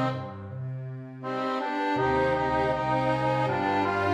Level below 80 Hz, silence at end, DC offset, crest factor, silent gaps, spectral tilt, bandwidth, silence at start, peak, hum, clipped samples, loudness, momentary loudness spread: -52 dBFS; 0 s; under 0.1%; 14 dB; none; -7 dB/octave; 10.5 kHz; 0 s; -14 dBFS; none; under 0.1%; -27 LUFS; 12 LU